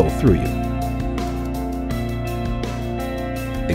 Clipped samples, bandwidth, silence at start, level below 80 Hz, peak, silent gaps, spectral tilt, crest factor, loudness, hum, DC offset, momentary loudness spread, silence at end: under 0.1%; 16 kHz; 0 s; -28 dBFS; -2 dBFS; none; -7 dB/octave; 18 dB; -23 LUFS; none; under 0.1%; 8 LU; 0 s